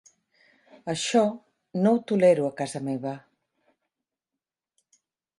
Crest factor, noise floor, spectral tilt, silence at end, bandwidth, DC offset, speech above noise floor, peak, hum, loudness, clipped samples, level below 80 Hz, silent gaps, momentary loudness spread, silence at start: 18 dB; -89 dBFS; -5.5 dB/octave; 2.2 s; 11.5 kHz; under 0.1%; 65 dB; -8 dBFS; none; -25 LUFS; under 0.1%; -74 dBFS; none; 17 LU; 0.85 s